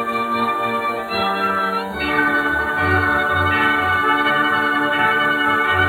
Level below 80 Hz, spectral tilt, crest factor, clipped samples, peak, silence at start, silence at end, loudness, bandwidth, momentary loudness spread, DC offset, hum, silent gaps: -48 dBFS; -5 dB/octave; 14 dB; under 0.1%; -4 dBFS; 0 s; 0 s; -17 LUFS; 16.5 kHz; 5 LU; under 0.1%; none; none